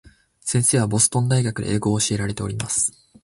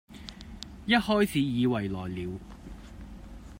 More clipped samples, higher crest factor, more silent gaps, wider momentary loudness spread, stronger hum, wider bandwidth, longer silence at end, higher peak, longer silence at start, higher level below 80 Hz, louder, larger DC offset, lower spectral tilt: neither; about the same, 20 dB vs 22 dB; neither; second, 8 LU vs 22 LU; neither; second, 12 kHz vs 16 kHz; first, 0.35 s vs 0 s; first, -2 dBFS vs -10 dBFS; first, 0.45 s vs 0.1 s; about the same, -46 dBFS vs -48 dBFS; first, -20 LUFS vs -28 LUFS; neither; second, -4 dB/octave vs -6 dB/octave